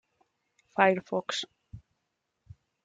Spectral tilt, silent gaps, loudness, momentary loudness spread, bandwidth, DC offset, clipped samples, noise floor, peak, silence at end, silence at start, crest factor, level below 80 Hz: -4 dB/octave; none; -28 LUFS; 13 LU; 9.4 kHz; under 0.1%; under 0.1%; -82 dBFS; -6 dBFS; 1.05 s; 0.75 s; 26 dB; -66 dBFS